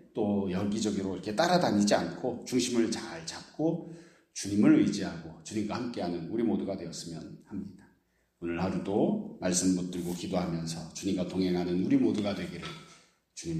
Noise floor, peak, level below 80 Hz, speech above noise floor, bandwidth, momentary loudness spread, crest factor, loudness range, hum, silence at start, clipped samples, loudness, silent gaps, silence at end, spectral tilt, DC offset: -71 dBFS; -10 dBFS; -64 dBFS; 41 dB; 15 kHz; 16 LU; 20 dB; 6 LU; none; 0.15 s; under 0.1%; -30 LUFS; none; 0 s; -5 dB/octave; under 0.1%